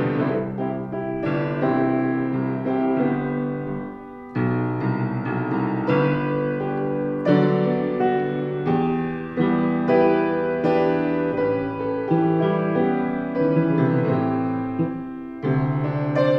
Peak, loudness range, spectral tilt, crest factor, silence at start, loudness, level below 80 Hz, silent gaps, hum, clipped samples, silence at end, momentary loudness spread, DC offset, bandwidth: -4 dBFS; 3 LU; -10 dB/octave; 16 dB; 0 s; -22 LUFS; -54 dBFS; none; none; under 0.1%; 0 s; 7 LU; under 0.1%; 5.8 kHz